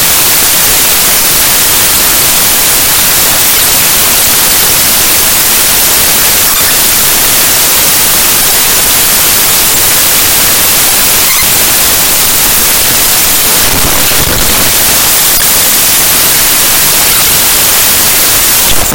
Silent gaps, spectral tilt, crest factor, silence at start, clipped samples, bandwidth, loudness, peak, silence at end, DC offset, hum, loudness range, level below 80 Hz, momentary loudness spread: none; 0 dB/octave; 6 dB; 0 s; 5%; over 20 kHz; -3 LUFS; 0 dBFS; 0 s; 3%; none; 1 LU; -26 dBFS; 1 LU